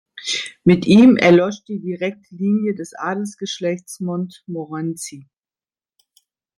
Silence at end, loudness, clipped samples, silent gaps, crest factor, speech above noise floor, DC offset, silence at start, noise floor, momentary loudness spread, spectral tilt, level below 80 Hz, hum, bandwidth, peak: 1.35 s; -18 LUFS; under 0.1%; none; 18 dB; over 73 dB; under 0.1%; 0.15 s; under -90 dBFS; 17 LU; -6 dB/octave; -58 dBFS; none; 13 kHz; -2 dBFS